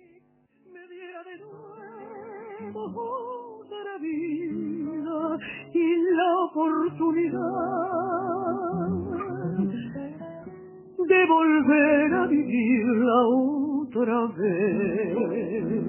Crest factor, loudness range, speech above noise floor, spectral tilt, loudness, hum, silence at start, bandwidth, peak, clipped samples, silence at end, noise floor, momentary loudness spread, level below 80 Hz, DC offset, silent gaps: 18 dB; 14 LU; 38 dB; -10.5 dB/octave; -25 LUFS; none; 0.7 s; 3.2 kHz; -8 dBFS; under 0.1%; 0 s; -62 dBFS; 22 LU; -60 dBFS; under 0.1%; none